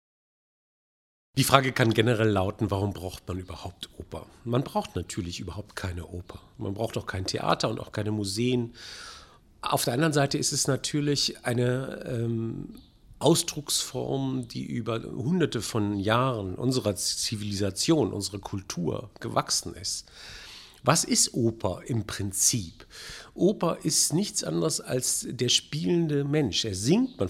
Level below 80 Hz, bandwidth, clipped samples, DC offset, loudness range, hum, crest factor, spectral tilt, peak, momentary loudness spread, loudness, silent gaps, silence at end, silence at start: -54 dBFS; 16 kHz; under 0.1%; under 0.1%; 6 LU; none; 28 dB; -4 dB/octave; 0 dBFS; 16 LU; -27 LUFS; none; 0 s; 1.35 s